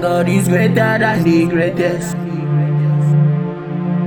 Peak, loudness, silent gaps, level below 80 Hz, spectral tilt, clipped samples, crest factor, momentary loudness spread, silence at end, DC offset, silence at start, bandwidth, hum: -2 dBFS; -15 LUFS; none; -50 dBFS; -7 dB/octave; under 0.1%; 12 dB; 8 LU; 0 s; under 0.1%; 0 s; 17.5 kHz; none